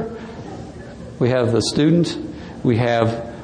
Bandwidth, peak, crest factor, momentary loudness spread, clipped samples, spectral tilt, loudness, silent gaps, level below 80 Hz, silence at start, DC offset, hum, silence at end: 10 kHz; -2 dBFS; 18 dB; 18 LU; under 0.1%; -6 dB/octave; -19 LUFS; none; -46 dBFS; 0 s; under 0.1%; none; 0 s